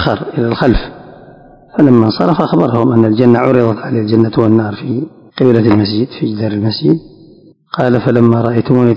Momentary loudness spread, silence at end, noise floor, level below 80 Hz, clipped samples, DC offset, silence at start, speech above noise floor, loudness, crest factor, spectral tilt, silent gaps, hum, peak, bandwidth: 9 LU; 0 s; -42 dBFS; -34 dBFS; 2%; under 0.1%; 0 s; 31 dB; -12 LUFS; 12 dB; -9.5 dB/octave; none; none; 0 dBFS; 5.6 kHz